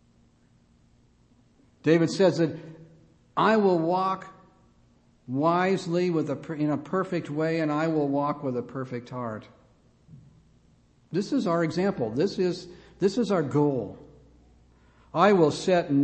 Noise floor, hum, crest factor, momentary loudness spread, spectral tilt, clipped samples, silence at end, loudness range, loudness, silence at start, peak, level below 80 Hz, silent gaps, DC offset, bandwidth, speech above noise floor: -61 dBFS; none; 20 dB; 13 LU; -6.5 dB/octave; under 0.1%; 0 s; 6 LU; -26 LUFS; 1.85 s; -6 dBFS; -64 dBFS; none; under 0.1%; 8.8 kHz; 36 dB